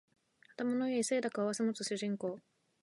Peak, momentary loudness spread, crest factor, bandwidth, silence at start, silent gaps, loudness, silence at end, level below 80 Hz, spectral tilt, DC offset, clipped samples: -22 dBFS; 9 LU; 16 dB; 11.5 kHz; 0.6 s; none; -36 LUFS; 0.45 s; -88 dBFS; -4 dB/octave; under 0.1%; under 0.1%